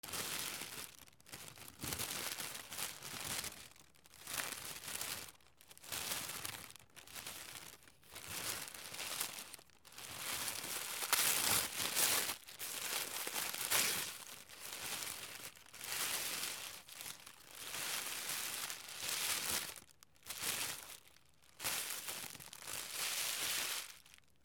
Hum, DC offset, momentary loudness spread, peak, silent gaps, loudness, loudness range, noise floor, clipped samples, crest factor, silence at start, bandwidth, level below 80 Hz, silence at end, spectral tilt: none; under 0.1%; 19 LU; -14 dBFS; none; -40 LUFS; 9 LU; -68 dBFS; under 0.1%; 28 dB; 0.05 s; over 20 kHz; -74 dBFS; 0.3 s; 0 dB/octave